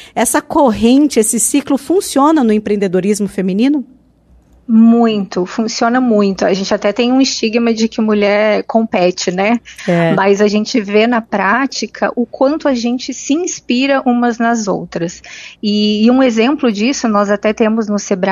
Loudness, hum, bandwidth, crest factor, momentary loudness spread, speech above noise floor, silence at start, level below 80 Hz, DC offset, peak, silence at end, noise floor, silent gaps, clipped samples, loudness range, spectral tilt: -13 LUFS; none; 14 kHz; 12 dB; 7 LU; 35 dB; 0 s; -48 dBFS; under 0.1%; 0 dBFS; 0 s; -48 dBFS; none; under 0.1%; 3 LU; -4.5 dB/octave